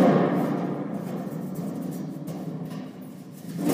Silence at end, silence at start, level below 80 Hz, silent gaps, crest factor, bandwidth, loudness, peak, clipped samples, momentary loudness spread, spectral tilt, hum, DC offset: 0 s; 0 s; -72 dBFS; none; 18 dB; 15.5 kHz; -29 LUFS; -8 dBFS; under 0.1%; 15 LU; -7.5 dB/octave; none; under 0.1%